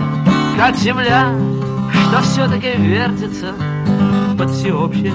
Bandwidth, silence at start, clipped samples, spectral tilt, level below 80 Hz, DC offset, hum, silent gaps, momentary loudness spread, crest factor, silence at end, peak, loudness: 8 kHz; 0 s; under 0.1%; -6.5 dB/octave; -38 dBFS; under 0.1%; none; none; 6 LU; 14 dB; 0 s; 0 dBFS; -15 LUFS